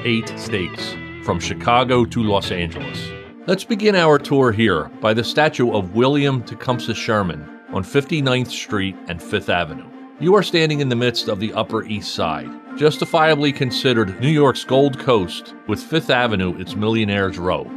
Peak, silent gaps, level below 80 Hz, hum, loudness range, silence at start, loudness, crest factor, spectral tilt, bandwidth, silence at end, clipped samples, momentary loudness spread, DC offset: -2 dBFS; none; -50 dBFS; none; 3 LU; 0 s; -19 LUFS; 16 dB; -5.5 dB/octave; 14.5 kHz; 0 s; under 0.1%; 12 LU; under 0.1%